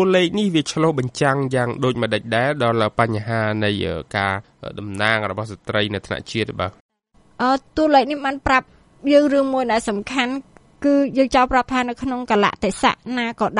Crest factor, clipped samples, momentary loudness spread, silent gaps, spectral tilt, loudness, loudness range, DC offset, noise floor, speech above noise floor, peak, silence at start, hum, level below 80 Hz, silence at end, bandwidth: 18 dB; under 0.1%; 9 LU; 6.80-6.89 s; -5.5 dB/octave; -20 LUFS; 4 LU; under 0.1%; -55 dBFS; 36 dB; -2 dBFS; 0 s; none; -46 dBFS; 0 s; 11.5 kHz